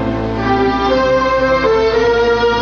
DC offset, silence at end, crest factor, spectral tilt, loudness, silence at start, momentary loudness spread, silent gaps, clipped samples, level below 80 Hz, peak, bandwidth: under 0.1%; 0 s; 10 dB; -6 dB/octave; -13 LUFS; 0 s; 3 LU; none; under 0.1%; -30 dBFS; -4 dBFS; 7 kHz